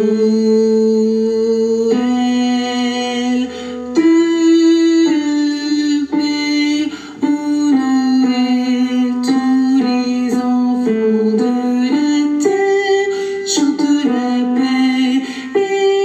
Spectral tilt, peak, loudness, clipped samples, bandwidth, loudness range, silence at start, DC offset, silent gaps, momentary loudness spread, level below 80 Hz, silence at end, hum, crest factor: -4.5 dB/octave; -2 dBFS; -15 LUFS; under 0.1%; 8.8 kHz; 2 LU; 0 s; under 0.1%; none; 6 LU; -56 dBFS; 0 s; none; 12 dB